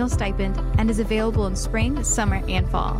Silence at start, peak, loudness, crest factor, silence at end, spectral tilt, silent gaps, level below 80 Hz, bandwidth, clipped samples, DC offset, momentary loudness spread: 0 s; -10 dBFS; -23 LUFS; 12 dB; 0 s; -5 dB/octave; none; -26 dBFS; 14.5 kHz; under 0.1%; under 0.1%; 3 LU